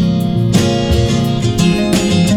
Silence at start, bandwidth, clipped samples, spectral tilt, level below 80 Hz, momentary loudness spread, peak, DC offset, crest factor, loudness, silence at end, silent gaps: 0 s; 16 kHz; under 0.1%; -6 dB/octave; -26 dBFS; 2 LU; 0 dBFS; under 0.1%; 12 dB; -13 LUFS; 0 s; none